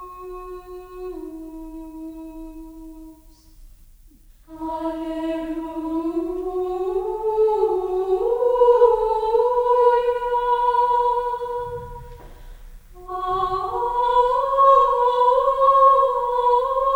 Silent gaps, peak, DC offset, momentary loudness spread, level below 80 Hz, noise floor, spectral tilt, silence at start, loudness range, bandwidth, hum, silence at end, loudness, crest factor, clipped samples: none; -4 dBFS; under 0.1%; 21 LU; -44 dBFS; -49 dBFS; -6 dB/octave; 0 s; 20 LU; 16.5 kHz; none; 0 s; -19 LUFS; 18 dB; under 0.1%